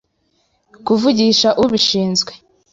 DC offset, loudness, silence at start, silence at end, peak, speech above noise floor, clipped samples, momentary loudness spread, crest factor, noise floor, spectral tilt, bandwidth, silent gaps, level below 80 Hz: under 0.1%; -14 LUFS; 0.85 s; 0.35 s; -2 dBFS; 49 dB; under 0.1%; 9 LU; 14 dB; -64 dBFS; -4 dB/octave; 7.8 kHz; none; -52 dBFS